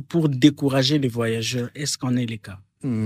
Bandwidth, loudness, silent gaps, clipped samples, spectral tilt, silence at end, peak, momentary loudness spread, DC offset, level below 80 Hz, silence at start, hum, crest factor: 15.5 kHz; -22 LUFS; none; under 0.1%; -5.5 dB/octave; 0 s; -2 dBFS; 13 LU; under 0.1%; -60 dBFS; 0 s; none; 20 dB